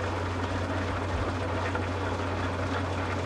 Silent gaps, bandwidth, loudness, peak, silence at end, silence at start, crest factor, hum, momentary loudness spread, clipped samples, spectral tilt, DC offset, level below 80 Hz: none; 11 kHz; -31 LUFS; -16 dBFS; 0 s; 0 s; 14 dB; none; 1 LU; under 0.1%; -6 dB/octave; under 0.1%; -44 dBFS